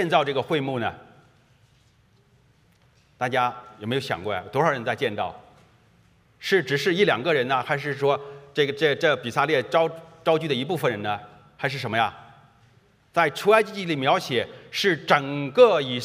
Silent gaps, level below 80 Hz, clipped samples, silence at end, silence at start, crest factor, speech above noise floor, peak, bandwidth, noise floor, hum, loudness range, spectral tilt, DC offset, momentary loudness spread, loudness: none; -68 dBFS; under 0.1%; 0 s; 0 s; 22 dB; 37 dB; -2 dBFS; 15.5 kHz; -60 dBFS; none; 7 LU; -5 dB/octave; under 0.1%; 10 LU; -23 LUFS